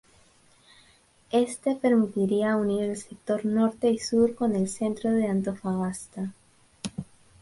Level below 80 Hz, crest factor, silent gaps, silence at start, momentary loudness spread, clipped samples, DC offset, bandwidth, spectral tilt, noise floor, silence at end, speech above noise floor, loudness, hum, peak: -62 dBFS; 16 dB; none; 1.3 s; 13 LU; under 0.1%; under 0.1%; 11.5 kHz; -6 dB/octave; -60 dBFS; 0.4 s; 35 dB; -27 LUFS; none; -12 dBFS